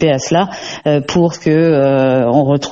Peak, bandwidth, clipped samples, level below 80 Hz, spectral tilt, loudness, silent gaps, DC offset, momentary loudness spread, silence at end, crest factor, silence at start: 0 dBFS; 8 kHz; under 0.1%; -46 dBFS; -6 dB/octave; -13 LUFS; none; under 0.1%; 5 LU; 0 s; 12 dB; 0 s